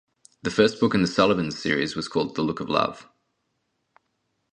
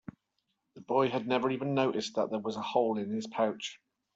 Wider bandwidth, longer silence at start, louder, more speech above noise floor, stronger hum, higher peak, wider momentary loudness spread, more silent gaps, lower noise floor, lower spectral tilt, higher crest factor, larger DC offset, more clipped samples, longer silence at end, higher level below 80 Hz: first, 10 kHz vs 8.2 kHz; second, 0.45 s vs 0.75 s; first, -24 LUFS vs -32 LUFS; about the same, 52 dB vs 50 dB; neither; first, -2 dBFS vs -12 dBFS; about the same, 7 LU vs 6 LU; neither; second, -75 dBFS vs -81 dBFS; about the same, -5.5 dB/octave vs -5.5 dB/octave; about the same, 22 dB vs 20 dB; neither; neither; first, 1.5 s vs 0.4 s; first, -56 dBFS vs -76 dBFS